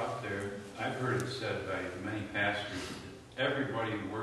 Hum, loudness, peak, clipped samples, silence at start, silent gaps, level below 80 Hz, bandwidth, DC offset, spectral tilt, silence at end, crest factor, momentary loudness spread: none; -36 LUFS; -20 dBFS; under 0.1%; 0 s; none; -64 dBFS; 12.5 kHz; under 0.1%; -5 dB/octave; 0 s; 16 dB; 8 LU